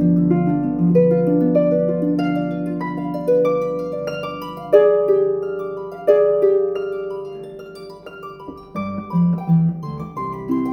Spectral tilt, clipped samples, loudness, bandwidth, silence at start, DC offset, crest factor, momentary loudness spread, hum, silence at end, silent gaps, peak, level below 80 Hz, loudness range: -10 dB/octave; under 0.1%; -19 LUFS; 6 kHz; 0 s; under 0.1%; 18 dB; 18 LU; none; 0 s; none; 0 dBFS; -50 dBFS; 5 LU